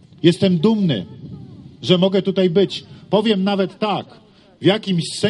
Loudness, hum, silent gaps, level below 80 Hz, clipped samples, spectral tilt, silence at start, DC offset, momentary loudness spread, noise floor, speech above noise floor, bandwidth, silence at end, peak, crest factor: -18 LUFS; none; none; -58 dBFS; under 0.1%; -6.5 dB/octave; 0.25 s; under 0.1%; 14 LU; -37 dBFS; 20 dB; 11.5 kHz; 0 s; 0 dBFS; 18 dB